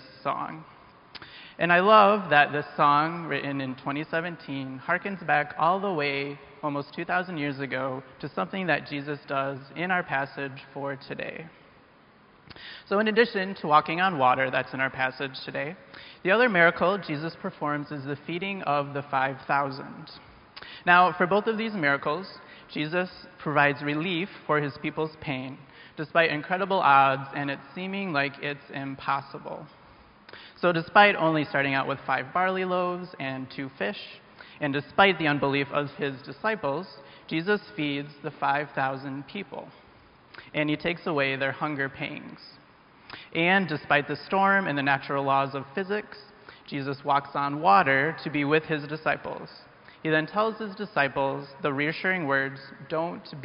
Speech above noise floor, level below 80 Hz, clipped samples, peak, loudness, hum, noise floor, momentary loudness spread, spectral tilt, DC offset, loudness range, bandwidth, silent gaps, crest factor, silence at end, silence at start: 30 dB; -66 dBFS; under 0.1%; -4 dBFS; -26 LUFS; none; -56 dBFS; 17 LU; -3 dB/octave; under 0.1%; 6 LU; 5.6 kHz; none; 24 dB; 0 s; 0 s